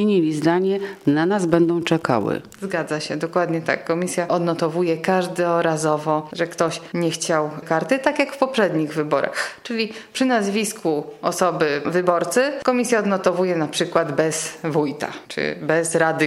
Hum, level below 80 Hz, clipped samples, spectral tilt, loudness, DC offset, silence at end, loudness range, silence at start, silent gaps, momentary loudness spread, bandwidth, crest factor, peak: none; -64 dBFS; under 0.1%; -5 dB/octave; -21 LUFS; under 0.1%; 0 s; 2 LU; 0 s; none; 6 LU; 14.5 kHz; 18 dB; -2 dBFS